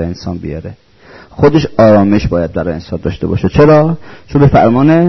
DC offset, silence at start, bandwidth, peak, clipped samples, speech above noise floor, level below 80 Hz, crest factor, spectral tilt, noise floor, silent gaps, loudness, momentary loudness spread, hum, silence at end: under 0.1%; 0 s; 6.2 kHz; 0 dBFS; under 0.1%; 28 dB; -30 dBFS; 10 dB; -8.5 dB/octave; -38 dBFS; none; -10 LUFS; 15 LU; none; 0 s